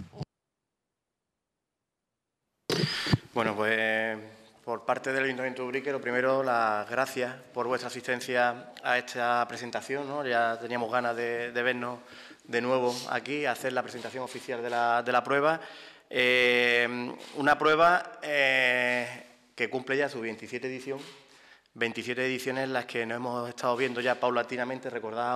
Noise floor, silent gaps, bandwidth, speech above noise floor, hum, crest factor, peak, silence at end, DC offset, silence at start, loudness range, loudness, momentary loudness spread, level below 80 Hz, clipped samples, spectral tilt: -86 dBFS; none; 15 kHz; 57 dB; none; 18 dB; -12 dBFS; 0 s; under 0.1%; 0 s; 8 LU; -29 LUFS; 14 LU; -68 dBFS; under 0.1%; -4.5 dB/octave